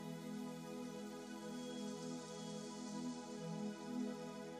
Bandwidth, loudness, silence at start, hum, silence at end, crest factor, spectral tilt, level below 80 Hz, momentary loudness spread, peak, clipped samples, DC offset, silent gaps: 15 kHz; -48 LUFS; 0 s; none; 0 s; 14 dB; -5 dB/octave; -78 dBFS; 4 LU; -34 dBFS; under 0.1%; under 0.1%; none